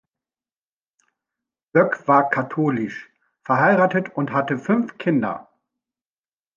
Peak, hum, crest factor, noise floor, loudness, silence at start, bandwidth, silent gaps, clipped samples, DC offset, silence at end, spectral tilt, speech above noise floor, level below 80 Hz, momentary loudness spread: -2 dBFS; none; 20 dB; under -90 dBFS; -20 LUFS; 1.75 s; 7.2 kHz; none; under 0.1%; under 0.1%; 1.15 s; -8.5 dB/octave; over 70 dB; -70 dBFS; 12 LU